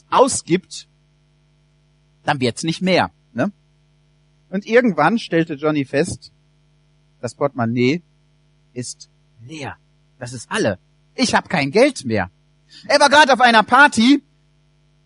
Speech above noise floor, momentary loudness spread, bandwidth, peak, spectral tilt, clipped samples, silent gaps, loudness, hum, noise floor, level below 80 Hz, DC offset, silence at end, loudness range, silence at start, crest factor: 41 dB; 21 LU; 11 kHz; 0 dBFS; -4 dB/octave; under 0.1%; none; -17 LUFS; none; -58 dBFS; -56 dBFS; under 0.1%; 0.85 s; 11 LU; 0.1 s; 20 dB